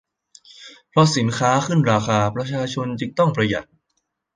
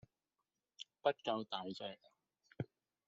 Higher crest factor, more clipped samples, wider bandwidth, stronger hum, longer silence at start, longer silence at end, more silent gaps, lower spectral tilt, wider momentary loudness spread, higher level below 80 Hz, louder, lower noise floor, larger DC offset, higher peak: about the same, 20 dB vs 24 dB; neither; first, 9.8 kHz vs 7.6 kHz; neither; second, 0.6 s vs 0.8 s; first, 0.7 s vs 0.45 s; neither; first, -5.5 dB/octave vs -3 dB/octave; second, 8 LU vs 17 LU; first, -54 dBFS vs -84 dBFS; first, -20 LUFS vs -43 LUFS; second, -73 dBFS vs under -90 dBFS; neither; first, -2 dBFS vs -20 dBFS